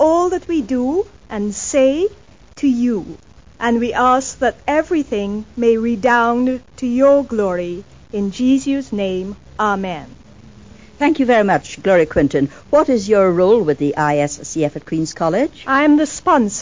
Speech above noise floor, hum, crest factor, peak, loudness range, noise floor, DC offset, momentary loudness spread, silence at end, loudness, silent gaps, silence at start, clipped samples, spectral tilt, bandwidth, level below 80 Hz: 26 dB; none; 14 dB; -2 dBFS; 4 LU; -42 dBFS; 0.4%; 10 LU; 0 s; -17 LUFS; none; 0 s; under 0.1%; -5.5 dB/octave; 7.6 kHz; -44 dBFS